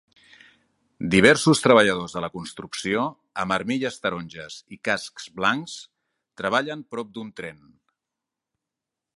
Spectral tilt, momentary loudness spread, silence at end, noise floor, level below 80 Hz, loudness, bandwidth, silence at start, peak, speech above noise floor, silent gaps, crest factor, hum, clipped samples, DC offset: -4.5 dB/octave; 20 LU; 1.65 s; -86 dBFS; -58 dBFS; -22 LUFS; 11.5 kHz; 1 s; 0 dBFS; 63 dB; none; 24 dB; none; under 0.1%; under 0.1%